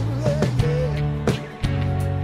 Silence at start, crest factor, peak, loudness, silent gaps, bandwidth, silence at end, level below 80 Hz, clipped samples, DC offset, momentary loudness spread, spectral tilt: 0 s; 16 dB; -6 dBFS; -23 LUFS; none; 12.5 kHz; 0 s; -34 dBFS; under 0.1%; under 0.1%; 4 LU; -7.5 dB/octave